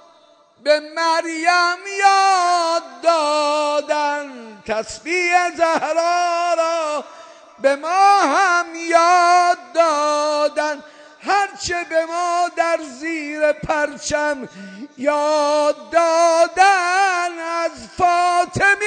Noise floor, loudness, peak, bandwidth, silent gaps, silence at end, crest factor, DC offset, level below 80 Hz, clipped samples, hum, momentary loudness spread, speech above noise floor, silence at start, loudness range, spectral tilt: -52 dBFS; -17 LUFS; -2 dBFS; 9.4 kHz; none; 0 s; 16 dB; under 0.1%; -54 dBFS; under 0.1%; none; 11 LU; 34 dB; 0.65 s; 5 LU; -2.5 dB/octave